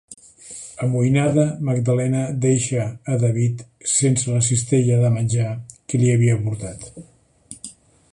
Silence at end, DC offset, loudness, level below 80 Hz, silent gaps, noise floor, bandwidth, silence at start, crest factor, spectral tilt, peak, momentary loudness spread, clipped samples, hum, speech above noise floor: 0.4 s; under 0.1%; -20 LUFS; -52 dBFS; none; -44 dBFS; 11.5 kHz; 0.1 s; 16 dB; -6 dB/octave; -4 dBFS; 19 LU; under 0.1%; none; 25 dB